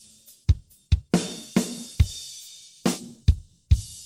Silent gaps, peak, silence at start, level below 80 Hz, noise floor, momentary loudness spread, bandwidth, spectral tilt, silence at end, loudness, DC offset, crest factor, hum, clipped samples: none; -8 dBFS; 0.5 s; -30 dBFS; -46 dBFS; 9 LU; 16 kHz; -5.5 dB/octave; 0 s; -27 LUFS; under 0.1%; 18 dB; none; under 0.1%